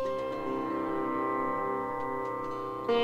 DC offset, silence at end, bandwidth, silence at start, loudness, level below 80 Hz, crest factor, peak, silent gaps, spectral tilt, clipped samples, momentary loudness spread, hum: under 0.1%; 0 s; 15.5 kHz; 0 s; -33 LUFS; -62 dBFS; 14 dB; -18 dBFS; none; -6.5 dB/octave; under 0.1%; 4 LU; none